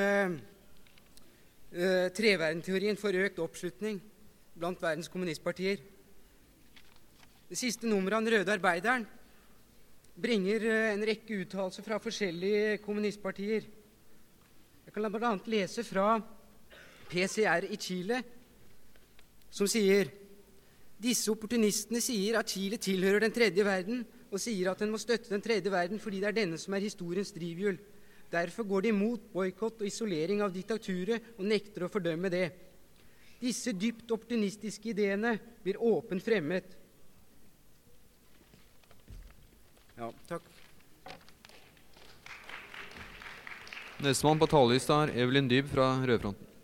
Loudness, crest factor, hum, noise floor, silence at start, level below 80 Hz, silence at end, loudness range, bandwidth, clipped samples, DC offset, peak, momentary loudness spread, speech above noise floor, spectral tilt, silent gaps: -32 LUFS; 22 dB; none; -60 dBFS; 0 s; -64 dBFS; 0 s; 10 LU; 17 kHz; under 0.1%; under 0.1%; -10 dBFS; 16 LU; 28 dB; -4.5 dB/octave; none